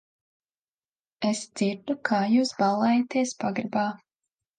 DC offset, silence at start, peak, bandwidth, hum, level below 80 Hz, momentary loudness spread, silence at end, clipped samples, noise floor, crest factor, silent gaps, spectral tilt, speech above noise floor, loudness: under 0.1%; 1.2 s; -8 dBFS; 9.6 kHz; none; -74 dBFS; 8 LU; 0.65 s; under 0.1%; under -90 dBFS; 18 dB; none; -5 dB/octave; over 65 dB; -26 LUFS